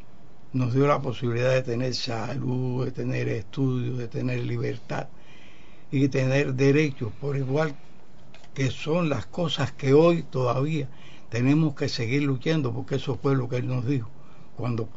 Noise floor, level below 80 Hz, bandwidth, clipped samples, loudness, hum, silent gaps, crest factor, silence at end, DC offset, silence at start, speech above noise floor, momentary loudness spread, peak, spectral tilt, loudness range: -52 dBFS; -58 dBFS; 7.8 kHz; under 0.1%; -26 LUFS; none; none; 18 dB; 0.05 s; 2%; 0.55 s; 27 dB; 9 LU; -8 dBFS; -7 dB/octave; 5 LU